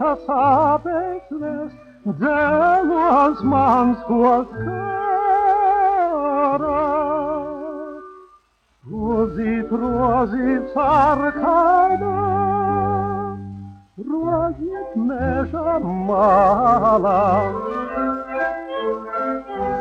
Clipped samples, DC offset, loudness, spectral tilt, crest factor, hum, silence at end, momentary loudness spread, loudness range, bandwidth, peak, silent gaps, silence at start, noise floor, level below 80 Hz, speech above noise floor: under 0.1%; under 0.1%; -19 LUFS; -9 dB/octave; 14 dB; none; 0 s; 12 LU; 6 LU; 7.4 kHz; -4 dBFS; none; 0 s; -57 dBFS; -44 dBFS; 40 dB